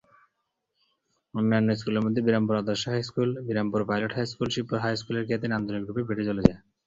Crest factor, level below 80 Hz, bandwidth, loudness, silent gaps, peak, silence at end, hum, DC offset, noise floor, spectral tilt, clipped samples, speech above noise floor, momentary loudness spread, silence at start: 26 dB; -50 dBFS; 7.8 kHz; -27 LUFS; none; -2 dBFS; 0.3 s; none; under 0.1%; -79 dBFS; -6.5 dB/octave; under 0.1%; 53 dB; 6 LU; 1.35 s